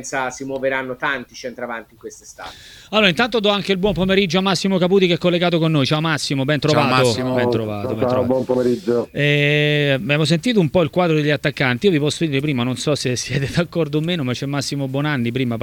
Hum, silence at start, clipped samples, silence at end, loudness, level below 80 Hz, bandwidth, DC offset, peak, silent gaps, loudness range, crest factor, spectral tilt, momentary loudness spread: none; 0 s; under 0.1%; 0 s; -18 LUFS; -48 dBFS; 18 kHz; under 0.1%; 0 dBFS; none; 4 LU; 18 dB; -5.5 dB/octave; 9 LU